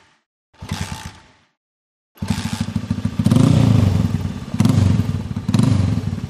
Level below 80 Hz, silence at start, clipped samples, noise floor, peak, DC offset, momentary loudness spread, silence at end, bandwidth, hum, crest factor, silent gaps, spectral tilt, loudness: -36 dBFS; 0.6 s; under 0.1%; -44 dBFS; -2 dBFS; under 0.1%; 16 LU; 0 s; 14.5 kHz; none; 16 dB; 1.57-2.15 s; -7 dB/octave; -18 LUFS